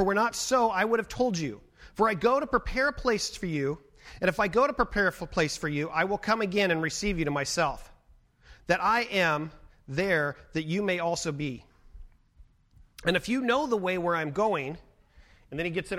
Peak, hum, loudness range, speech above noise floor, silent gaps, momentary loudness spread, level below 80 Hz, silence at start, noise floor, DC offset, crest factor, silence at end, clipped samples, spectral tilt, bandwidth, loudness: -10 dBFS; none; 4 LU; 33 dB; none; 10 LU; -48 dBFS; 0 s; -60 dBFS; under 0.1%; 18 dB; 0 s; under 0.1%; -4.5 dB/octave; 16 kHz; -28 LUFS